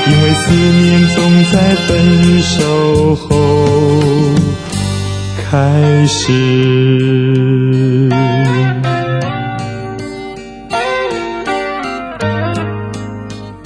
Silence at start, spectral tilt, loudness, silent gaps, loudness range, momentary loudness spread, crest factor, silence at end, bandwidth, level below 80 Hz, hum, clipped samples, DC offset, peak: 0 s; -6 dB/octave; -12 LUFS; none; 9 LU; 13 LU; 12 dB; 0 s; 10.5 kHz; -34 dBFS; none; under 0.1%; under 0.1%; 0 dBFS